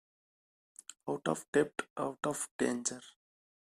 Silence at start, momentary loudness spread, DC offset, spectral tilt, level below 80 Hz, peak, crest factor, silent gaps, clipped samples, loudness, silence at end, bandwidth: 0.9 s; 16 LU; under 0.1%; -4 dB/octave; -76 dBFS; -16 dBFS; 22 dB; 1.48-1.53 s, 1.90-1.96 s, 2.51-2.59 s; under 0.1%; -36 LUFS; 0.7 s; 14.5 kHz